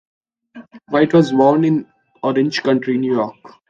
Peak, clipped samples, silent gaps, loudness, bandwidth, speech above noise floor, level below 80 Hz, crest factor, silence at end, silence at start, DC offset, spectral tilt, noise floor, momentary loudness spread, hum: -2 dBFS; under 0.1%; none; -16 LUFS; 7.6 kHz; 26 dB; -62 dBFS; 16 dB; 0.4 s; 0.55 s; under 0.1%; -7 dB/octave; -42 dBFS; 8 LU; none